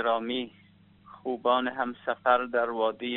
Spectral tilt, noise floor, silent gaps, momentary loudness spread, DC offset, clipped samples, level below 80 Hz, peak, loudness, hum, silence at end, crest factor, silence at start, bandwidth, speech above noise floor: -1 dB/octave; -56 dBFS; none; 10 LU; under 0.1%; under 0.1%; -72 dBFS; -10 dBFS; -28 LUFS; none; 0 s; 20 dB; 0 s; 4.2 kHz; 28 dB